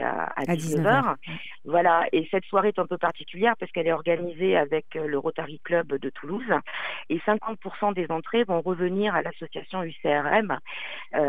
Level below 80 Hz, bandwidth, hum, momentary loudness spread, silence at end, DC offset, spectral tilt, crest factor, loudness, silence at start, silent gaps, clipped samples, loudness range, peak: -66 dBFS; 15 kHz; none; 11 LU; 0 s; 0.9%; -6 dB/octave; 20 dB; -26 LUFS; 0 s; none; under 0.1%; 4 LU; -6 dBFS